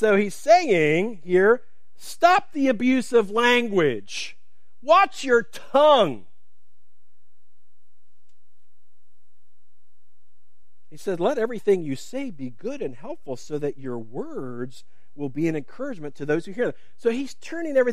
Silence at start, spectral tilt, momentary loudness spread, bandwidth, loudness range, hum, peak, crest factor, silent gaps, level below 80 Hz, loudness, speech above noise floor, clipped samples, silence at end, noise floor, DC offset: 0 s; -5 dB/octave; 16 LU; 15 kHz; 12 LU; none; -2 dBFS; 20 dB; none; -68 dBFS; -22 LUFS; 54 dB; under 0.1%; 0 s; -76 dBFS; 2%